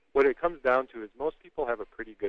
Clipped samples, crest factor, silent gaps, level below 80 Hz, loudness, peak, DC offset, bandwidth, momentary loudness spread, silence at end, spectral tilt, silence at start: under 0.1%; 18 dB; none; -54 dBFS; -29 LUFS; -12 dBFS; under 0.1%; 5.6 kHz; 11 LU; 0 s; -6.5 dB/octave; 0.15 s